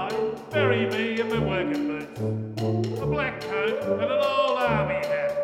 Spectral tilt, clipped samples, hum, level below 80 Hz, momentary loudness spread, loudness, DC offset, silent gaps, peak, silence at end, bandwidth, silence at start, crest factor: -6.5 dB/octave; under 0.1%; none; -50 dBFS; 6 LU; -25 LUFS; under 0.1%; none; -8 dBFS; 0 s; 15.5 kHz; 0 s; 16 dB